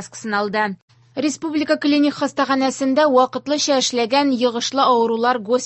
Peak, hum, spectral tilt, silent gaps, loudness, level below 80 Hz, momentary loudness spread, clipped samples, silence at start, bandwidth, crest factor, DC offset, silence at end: -2 dBFS; none; -3 dB/octave; 0.82-0.88 s; -18 LUFS; -66 dBFS; 7 LU; under 0.1%; 0 s; 8.6 kHz; 16 dB; under 0.1%; 0 s